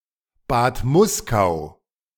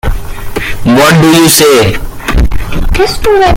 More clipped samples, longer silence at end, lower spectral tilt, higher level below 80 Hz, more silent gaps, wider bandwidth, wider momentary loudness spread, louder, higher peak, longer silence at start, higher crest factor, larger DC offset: second, under 0.1% vs 0.5%; first, 0.5 s vs 0 s; about the same, -5.5 dB/octave vs -4.5 dB/octave; second, -38 dBFS vs -16 dBFS; neither; about the same, 19 kHz vs over 20 kHz; second, 10 LU vs 14 LU; second, -20 LUFS vs -7 LUFS; second, -4 dBFS vs 0 dBFS; first, 0.5 s vs 0.05 s; first, 18 dB vs 6 dB; neither